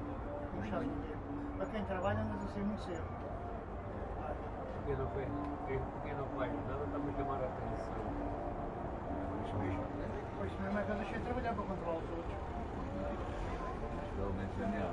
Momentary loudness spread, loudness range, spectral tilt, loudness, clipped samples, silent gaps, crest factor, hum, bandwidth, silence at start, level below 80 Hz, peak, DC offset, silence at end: 5 LU; 2 LU; -8 dB/octave; -40 LUFS; under 0.1%; none; 18 dB; none; 11 kHz; 0 s; -48 dBFS; -22 dBFS; under 0.1%; 0 s